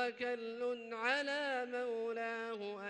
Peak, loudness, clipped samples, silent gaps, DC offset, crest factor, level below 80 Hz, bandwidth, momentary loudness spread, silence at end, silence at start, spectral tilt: -22 dBFS; -39 LUFS; under 0.1%; none; under 0.1%; 16 dB; -88 dBFS; 9.6 kHz; 5 LU; 0 s; 0 s; -3 dB/octave